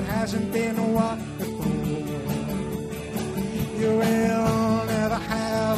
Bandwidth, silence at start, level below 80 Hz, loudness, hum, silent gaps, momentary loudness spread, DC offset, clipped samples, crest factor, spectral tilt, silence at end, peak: 15.5 kHz; 0 s; -44 dBFS; -25 LUFS; none; none; 8 LU; under 0.1%; under 0.1%; 14 dB; -6 dB/octave; 0 s; -10 dBFS